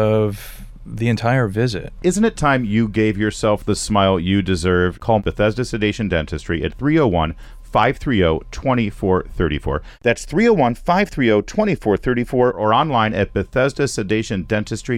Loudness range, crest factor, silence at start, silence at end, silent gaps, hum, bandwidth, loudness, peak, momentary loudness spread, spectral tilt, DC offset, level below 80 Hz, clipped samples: 2 LU; 14 dB; 0 s; 0 s; none; none; 14.5 kHz; -18 LUFS; -4 dBFS; 6 LU; -6 dB/octave; under 0.1%; -34 dBFS; under 0.1%